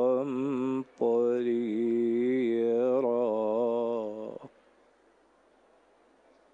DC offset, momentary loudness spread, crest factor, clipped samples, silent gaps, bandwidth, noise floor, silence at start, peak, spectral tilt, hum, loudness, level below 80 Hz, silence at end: under 0.1%; 7 LU; 14 dB; under 0.1%; none; 7.6 kHz; -64 dBFS; 0 s; -16 dBFS; -8 dB/octave; none; -29 LUFS; -80 dBFS; 2.05 s